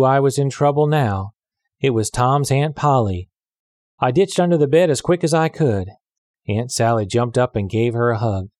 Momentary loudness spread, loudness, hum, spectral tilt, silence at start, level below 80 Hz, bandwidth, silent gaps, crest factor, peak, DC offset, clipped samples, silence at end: 9 LU; -18 LUFS; none; -6 dB/octave; 0 s; -50 dBFS; 13.5 kHz; 3.59-3.98 s, 6.18-6.34 s; 14 dB; -4 dBFS; under 0.1%; under 0.1%; 0.1 s